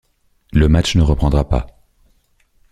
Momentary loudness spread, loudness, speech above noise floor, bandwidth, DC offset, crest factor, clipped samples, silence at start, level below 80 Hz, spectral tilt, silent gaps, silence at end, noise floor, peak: 8 LU; -16 LUFS; 44 dB; 10.5 kHz; under 0.1%; 16 dB; under 0.1%; 0.55 s; -22 dBFS; -6.5 dB/octave; none; 1 s; -58 dBFS; -2 dBFS